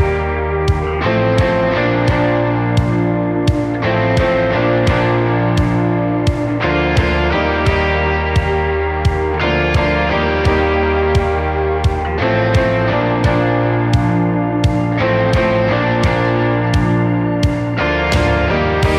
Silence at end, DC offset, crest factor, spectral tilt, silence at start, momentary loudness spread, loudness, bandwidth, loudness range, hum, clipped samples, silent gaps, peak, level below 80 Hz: 0 s; under 0.1%; 14 dB; -7 dB/octave; 0 s; 3 LU; -15 LUFS; 11 kHz; 1 LU; none; under 0.1%; none; -2 dBFS; -26 dBFS